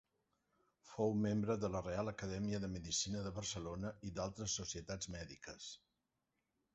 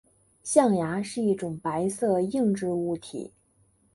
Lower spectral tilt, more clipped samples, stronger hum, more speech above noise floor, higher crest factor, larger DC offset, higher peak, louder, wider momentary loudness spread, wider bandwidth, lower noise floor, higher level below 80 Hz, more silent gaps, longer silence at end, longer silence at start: about the same, -5.5 dB/octave vs -6 dB/octave; neither; neither; first, 46 dB vs 39 dB; about the same, 20 dB vs 22 dB; neither; second, -24 dBFS vs -6 dBFS; second, -42 LUFS vs -26 LUFS; second, 13 LU vs 16 LU; second, 8 kHz vs 11.5 kHz; first, -87 dBFS vs -65 dBFS; about the same, -62 dBFS vs -64 dBFS; neither; first, 1 s vs 0.65 s; first, 0.85 s vs 0.45 s